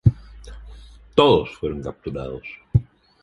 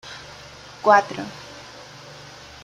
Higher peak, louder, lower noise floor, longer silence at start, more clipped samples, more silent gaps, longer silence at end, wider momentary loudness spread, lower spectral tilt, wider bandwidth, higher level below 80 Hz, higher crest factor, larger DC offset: about the same, -2 dBFS vs -2 dBFS; second, -22 LUFS vs -19 LUFS; about the same, -43 dBFS vs -42 dBFS; about the same, 0.05 s vs 0.05 s; neither; neither; second, 0.4 s vs 1.1 s; first, 26 LU vs 23 LU; first, -8 dB/octave vs -4 dB/octave; second, 10.5 kHz vs 13 kHz; first, -38 dBFS vs -60 dBFS; about the same, 20 dB vs 24 dB; neither